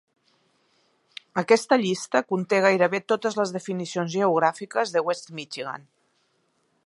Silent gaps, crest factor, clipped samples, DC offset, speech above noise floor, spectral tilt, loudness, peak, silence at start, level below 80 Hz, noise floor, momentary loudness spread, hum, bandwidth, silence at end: none; 20 dB; under 0.1%; under 0.1%; 46 dB; -4.5 dB/octave; -24 LUFS; -4 dBFS; 1.35 s; -78 dBFS; -69 dBFS; 14 LU; none; 11.5 kHz; 1.1 s